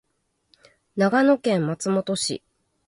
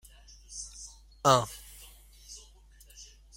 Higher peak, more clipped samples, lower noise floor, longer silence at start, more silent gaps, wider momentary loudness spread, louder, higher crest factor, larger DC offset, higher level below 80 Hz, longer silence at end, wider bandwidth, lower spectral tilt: about the same, -6 dBFS vs -8 dBFS; neither; first, -72 dBFS vs -56 dBFS; first, 0.95 s vs 0.5 s; neither; second, 11 LU vs 26 LU; first, -22 LUFS vs -29 LUFS; second, 18 dB vs 26 dB; neither; second, -68 dBFS vs -56 dBFS; first, 0.5 s vs 0.35 s; second, 11.5 kHz vs 16.5 kHz; first, -5 dB/octave vs -3.5 dB/octave